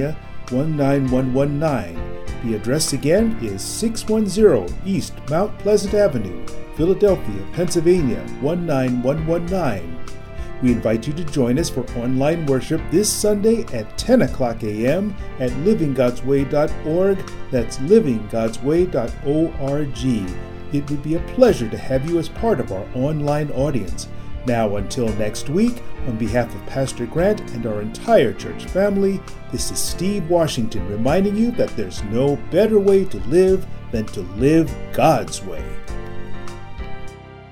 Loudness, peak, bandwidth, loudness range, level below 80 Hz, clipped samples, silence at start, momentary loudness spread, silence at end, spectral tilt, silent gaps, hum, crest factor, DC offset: -20 LUFS; 0 dBFS; 16.5 kHz; 4 LU; -34 dBFS; under 0.1%; 0 s; 14 LU; 0 s; -6 dB/octave; none; none; 18 dB; under 0.1%